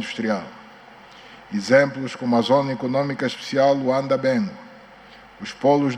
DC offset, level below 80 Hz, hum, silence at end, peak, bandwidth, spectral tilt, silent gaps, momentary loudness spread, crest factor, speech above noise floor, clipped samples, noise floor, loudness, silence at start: under 0.1%; -64 dBFS; none; 0 s; -4 dBFS; 10 kHz; -6 dB/octave; none; 13 LU; 18 dB; 25 dB; under 0.1%; -46 dBFS; -21 LUFS; 0 s